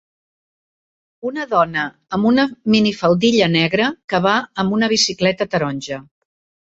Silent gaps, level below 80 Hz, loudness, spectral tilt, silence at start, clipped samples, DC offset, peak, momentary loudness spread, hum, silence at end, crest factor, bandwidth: 4.04-4.08 s; -54 dBFS; -17 LUFS; -4.5 dB/octave; 1.25 s; under 0.1%; under 0.1%; -2 dBFS; 11 LU; none; 0.75 s; 18 dB; 8 kHz